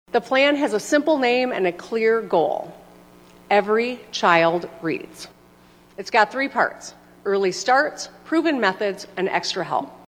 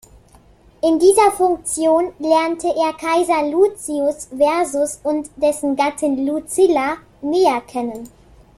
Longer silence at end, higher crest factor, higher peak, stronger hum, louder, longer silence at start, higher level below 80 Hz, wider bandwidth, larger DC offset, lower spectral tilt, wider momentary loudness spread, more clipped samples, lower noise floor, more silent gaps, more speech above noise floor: second, 0.15 s vs 0.5 s; about the same, 20 dB vs 16 dB; about the same, -2 dBFS vs -2 dBFS; first, 60 Hz at -55 dBFS vs none; second, -21 LUFS vs -18 LUFS; second, 0.15 s vs 0.85 s; second, -64 dBFS vs -52 dBFS; first, 16 kHz vs 14 kHz; neither; about the same, -4 dB/octave vs -3 dB/octave; first, 13 LU vs 9 LU; neither; about the same, -51 dBFS vs -49 dBFS; neither; about the same, 30 dB vs 32 dB